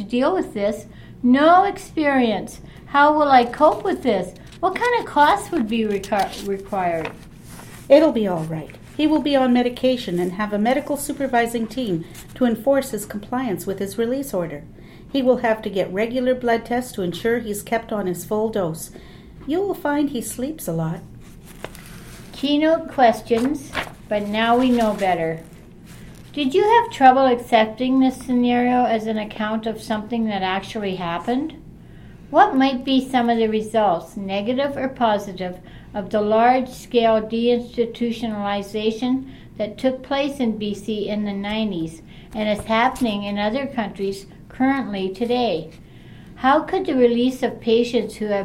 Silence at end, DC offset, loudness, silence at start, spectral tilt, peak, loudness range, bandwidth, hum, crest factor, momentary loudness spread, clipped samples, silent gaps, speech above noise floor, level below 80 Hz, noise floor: 0 s; under 0.1%; -20 LUFS; 0 s; -5.5 dB/octave; 0 dBFS; 6 LU; 16.5 kHz; none; 20 dB; 13 LU; under 0.1%; none; 22 dB; -48 dBFS; -41 dBFS